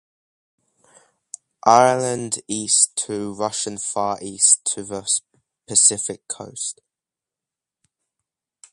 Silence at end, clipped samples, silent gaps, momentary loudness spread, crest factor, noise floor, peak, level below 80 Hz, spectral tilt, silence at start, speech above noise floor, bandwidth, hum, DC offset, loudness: 2 s; under 0.1%; none; 14 LU; 22 dB; -88 dBFS; 0 dBFS; -64 dBFS; -2 dB/octave; 1.65 s; 68 dB; 11.5 kHz; none; under 0.1%; -19 LUFS